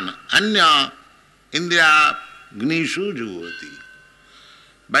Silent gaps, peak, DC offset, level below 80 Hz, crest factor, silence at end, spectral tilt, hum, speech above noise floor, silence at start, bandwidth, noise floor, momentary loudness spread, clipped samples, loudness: none; -4 dBFS; under 0.1%; -62 dBFS; 16 dB; 0 s; -2.5 dB/octave; none; 34 dB; 0 s; 12 kHz; -52 dBFS; 20 LU; under 0.1%; -17 LUFS